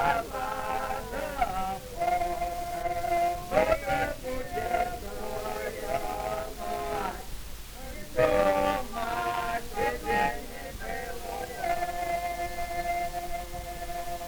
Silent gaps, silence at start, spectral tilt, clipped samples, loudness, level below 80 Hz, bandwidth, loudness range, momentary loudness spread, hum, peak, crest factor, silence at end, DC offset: none; 0 s; -4 dB/octave; under 0.1%; -31 LUFS; -42 dBFS; over 20 kHz; 4 LU; 10 LU; none; -10 dBFS; 20 dB; 0 s; under 0.1%